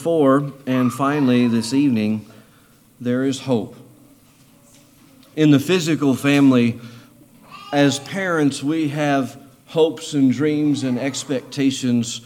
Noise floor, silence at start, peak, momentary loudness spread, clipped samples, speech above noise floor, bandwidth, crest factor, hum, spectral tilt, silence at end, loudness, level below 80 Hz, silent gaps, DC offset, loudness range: -52 dBFS; 0 s; -4 dBFS; 9 LU; under 0.1%; 34 dB; 15.5 kHz; 16 dB; none; -5.5 dB/octave; 0.05 s; -19 LUFS; -66 dBFS; none; under 0.1%; 5 LU